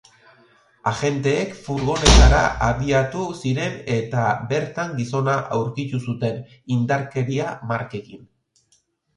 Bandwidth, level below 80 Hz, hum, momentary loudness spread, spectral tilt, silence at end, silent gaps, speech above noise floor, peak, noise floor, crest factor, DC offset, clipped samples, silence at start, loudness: 11 kHz; -26 dBFS; none; 12 LU; -5 dB/octave; 1 s; none; 44 dB; 0 dBFS; -64 dBFS; 20 dB; under 0.1%; under 0.1%; 0.85 s; -21 LUFS